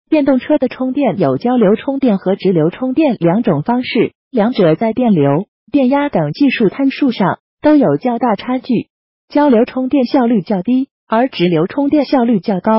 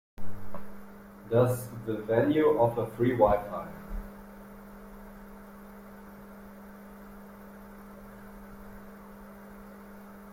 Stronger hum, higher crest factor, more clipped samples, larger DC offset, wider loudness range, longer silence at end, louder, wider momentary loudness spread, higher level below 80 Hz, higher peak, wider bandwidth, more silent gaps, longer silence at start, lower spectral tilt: neither; second, 10 dB vs 22 dB; neither; neither; second, 1 LU vs 21 LU; about the same, 0 s vs 0 s; first, -14 LUFS vs -27 LUFS; second, 5 LU vs 23 LU; about the same, -54 dBFS vs -50 dBFS; first, -2 dBFS vs -8 dBFS; second, 5.8 kHz vs 16.5 kHz; first, 4.15-4.31 s, 5.48-5.67 s, 7.40-7.57 s, 8.90-9.28 s, 10.91-11.07 s vs none; about the same, 0.1 s vs 0.2 s; first, -12 dB/octave vs -7.5 dB/octave